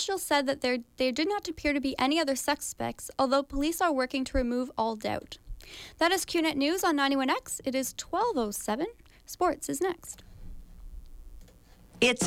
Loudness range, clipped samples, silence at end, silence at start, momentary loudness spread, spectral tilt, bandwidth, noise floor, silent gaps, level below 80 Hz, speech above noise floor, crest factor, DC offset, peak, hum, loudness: 4 LU; under 0.1%; 0 s; 0 s; 11 LU; -3 dB/octave; 16.5 kHz; -55 dBFS; none; -48 dBFS; 26 dB; 16 dB; under 0.1%; -14 dBFS; none; -29 LUFS